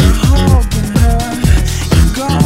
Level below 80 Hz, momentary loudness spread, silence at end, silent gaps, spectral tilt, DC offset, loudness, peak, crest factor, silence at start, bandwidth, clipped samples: -12 dBFS; 3 LU; 0 s; none; -5.5 dB/octave; under 0.1%; -12 LUFS; 0 dBFS; 10 dB; 0 s; 16.5 kHz; 0.9%